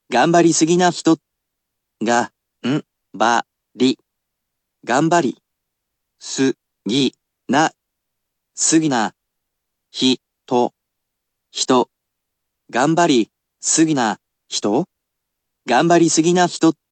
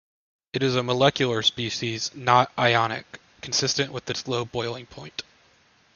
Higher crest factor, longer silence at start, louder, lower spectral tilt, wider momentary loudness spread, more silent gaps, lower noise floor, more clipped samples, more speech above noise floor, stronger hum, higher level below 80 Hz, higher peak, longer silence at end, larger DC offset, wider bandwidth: about the same, 18 dB vs 22 dB; second, 0.1 s vs 0.55 s; first, -18 LUFS vs -24 LUFS; about the same, -4 dB/octave vs -3.5 dB/octave; second, 13 LU vs 16 LU; neither; first, -78 dBFS vs -60 dBFS; neither; first, 61 dB vs 36 dB; neither; second, -72 dBFS vs -60 dBFS; about the same, -2 dBFS vs -2 dBFS; second, 0.2 s vs 0.75 s; neither; first, 9.2 kHz vs 7.4 kHz